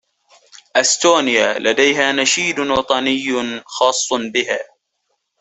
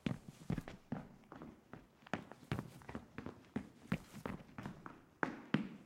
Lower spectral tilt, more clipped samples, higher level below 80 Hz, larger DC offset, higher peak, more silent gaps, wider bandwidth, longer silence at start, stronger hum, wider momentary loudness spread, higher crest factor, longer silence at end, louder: second, -1.5 dB/octave vs -6.5 dB/octave; neither; first, -56 dBFS vs -64 dBFS; neither; first, 0 dBFS vs -16 dBFS; neither; second, 8.4 kHz vs 16.5 kHz; first, 0.75 s vs 0 s; neither; second, 8 LU vs 13 LU; second, 18 dB vs 30 dB; first, 0.75 s vs 0 s; first, -16 LUFS vs -47 LUFS